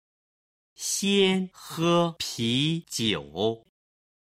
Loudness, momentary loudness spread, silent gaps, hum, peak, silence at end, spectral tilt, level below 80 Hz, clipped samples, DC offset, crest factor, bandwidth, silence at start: -26 LUFS; 7 LU; none; none; -8 dBFS; 0.75 s; -4 dB/octave; -62 dBFS; under 0.1%; under 0.1%; 18 dB; 16 kHz; 0.8 s